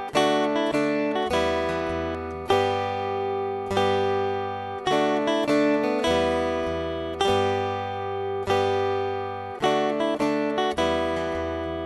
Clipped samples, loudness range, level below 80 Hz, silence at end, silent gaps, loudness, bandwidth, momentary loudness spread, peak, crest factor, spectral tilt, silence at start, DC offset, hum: under 0.1%; 2 LU; -48 dBFS; 0 s; none; -25 LUFS; 12 kHz; 7 LU; -8 dBFS; 16 dB; -5 dB/octave; 0 s; under 0.1%; none